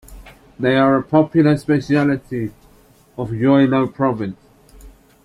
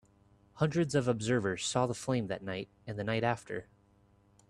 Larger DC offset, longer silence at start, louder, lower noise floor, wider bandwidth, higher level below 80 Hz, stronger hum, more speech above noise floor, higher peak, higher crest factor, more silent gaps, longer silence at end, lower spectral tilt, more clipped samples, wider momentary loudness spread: neither; second, 0.1 s vs 0.55 s; first, -17 LUFS vs -33 LUFS; second, -50 dBFS vs -66 dBFS; about the same, 11.5 kHz vs 12.5 kHz; first, -48 dBFS vs -64 dBFS; neither; about the same, 34 dB vs 33 dB; first, -2 dBFS vs -14 dBFS; about the same, 16 dB vs 20 dB; neither; second, 0.35 s vs 0.85 s; first, -8 dB/octave vs -5.5 dB/octave; neither; about the same, 13 LU vs 11 LU